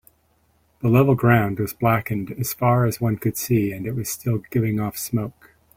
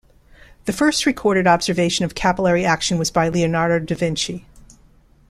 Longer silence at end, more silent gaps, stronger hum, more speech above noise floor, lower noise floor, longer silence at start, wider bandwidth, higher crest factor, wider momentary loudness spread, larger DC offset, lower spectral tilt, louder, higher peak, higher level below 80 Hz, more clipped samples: second, 0.45 s vs 0.7 s; neither; neither; first, 42 dB vs 33 dB; first, -63 dBFS vs -52 dBFS; first, 0.85 s vs 0.65 s; first, 16.5 kHz vs 14.5 kHz; about the same, 18 dB vs 18 dB; first, 10 LU vs 7 LU; neither; first, -6.5 dB/octave vs -4.5 dB/octave; second, -22 LUFS vs -19 LUFS; about the same, -4 dBFS vs -2 dBFS; second, -50 dBFS vs -44 dBFS; neither